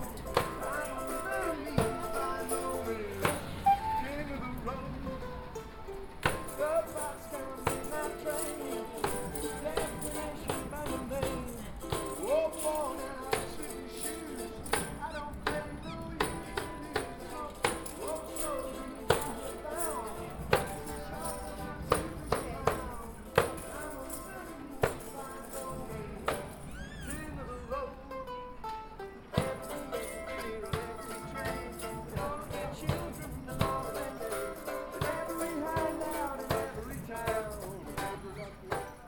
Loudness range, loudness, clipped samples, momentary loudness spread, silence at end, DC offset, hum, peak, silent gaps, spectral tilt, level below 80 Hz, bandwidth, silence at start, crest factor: 5 LU; -36 LUFS; under 0.1%; 10 LU; 0 s; under 0.1%; none; -8 dBFS; none; -4.5 dB/octave; -48 dBFS; 19 kHz; 0 s; 28 dB